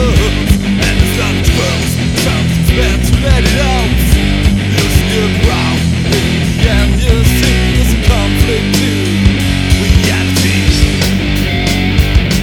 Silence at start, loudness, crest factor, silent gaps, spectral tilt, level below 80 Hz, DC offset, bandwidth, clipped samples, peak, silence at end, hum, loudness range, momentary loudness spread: 0 s; -11 LUFS; 10 dB; none; -5 dB/octave; -14 dBFS; under 0.1%; 18.5 kHz; 0.4%; 0 dBFS; 0 s; none; 1 LU; 2 LU